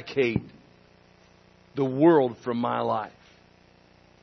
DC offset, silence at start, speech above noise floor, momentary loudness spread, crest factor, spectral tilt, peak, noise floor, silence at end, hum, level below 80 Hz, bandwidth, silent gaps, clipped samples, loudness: under 0.1%; 0 s; 33 dB; 13 LU; 20 dB; -8 dB/octave; -6 dBFS; -57 dBFS; 1.15 s; 60 Hz at -50 dBFS; -62 dBFS; 6.2 kHz; none; under 0.1%; -25 LUFS